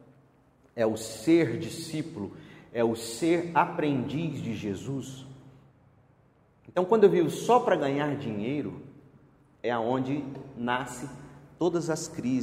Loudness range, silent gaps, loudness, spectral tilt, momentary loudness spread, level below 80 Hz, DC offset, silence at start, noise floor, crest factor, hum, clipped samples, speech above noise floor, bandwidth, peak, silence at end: 6 LU; none; -28 LUFS; -6 dB/octave; 17 LU; -64 dBFS; under 0.1%; 0.75 s; -62 dBFS; 22 dB; none; under 0.1%; 35 dB; 16 kHz; -8 dBFS; 0 s